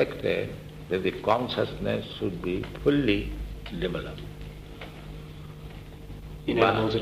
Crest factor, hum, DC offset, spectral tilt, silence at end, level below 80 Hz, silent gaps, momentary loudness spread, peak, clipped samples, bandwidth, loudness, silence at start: 22 dB; none; under 0.1%; -7 dB/octave; 0 s; -44 dBFS; none; 19 LU; -6 dBFS; under 0.1%; 15.5 kHz; -28 LUFS; 0 s